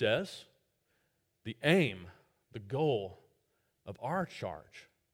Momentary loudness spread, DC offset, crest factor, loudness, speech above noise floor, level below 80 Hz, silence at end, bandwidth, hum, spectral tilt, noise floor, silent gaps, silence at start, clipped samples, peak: 23 LU; under 0.1%; 24 dB; -34 LUFS; 44 dB; -70 dBFS; 0.3 s; 16.5 kHz; none; -6 dB/octave; -78 dBFS; none; 0 s; under 0.1%; -12 dBFS